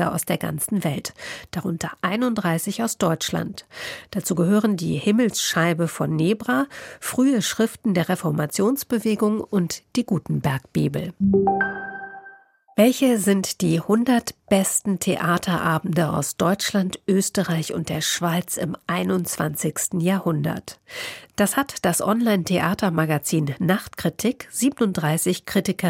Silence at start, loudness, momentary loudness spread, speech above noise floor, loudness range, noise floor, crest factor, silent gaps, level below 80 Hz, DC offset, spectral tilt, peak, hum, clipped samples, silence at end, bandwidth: 0 s; -22 LUFS; 9 LU; 26 dB; 3 LU; -48 dBFS; 18 dB; none; -56 dBFS; under 0.1%; -5 dB/octave; -4 dBFS; none; under 0.1%; 0 s; 16.5 kHz